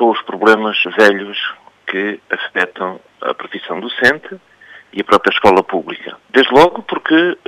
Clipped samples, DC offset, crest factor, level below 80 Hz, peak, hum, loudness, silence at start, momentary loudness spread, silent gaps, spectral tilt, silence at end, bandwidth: under 0.1%; under 0.1%; 14 dB; -52 dBFS; 0 dBFS; none; -14 LUFS; 0 s; 14 LU; none; -4.5 dB/octave; 0.1 s; 15.5 kHz